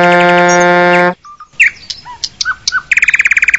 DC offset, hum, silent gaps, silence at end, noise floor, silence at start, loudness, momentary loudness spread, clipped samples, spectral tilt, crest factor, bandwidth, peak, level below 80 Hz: 0.5%; none; none; 0 s; -28 dBFS; 0 s; -9 LUFS; 15 LU; 0.2%; -3.5 dB/octave; 10 dB; 11 kHz; 0 dBFS; -46 dBFS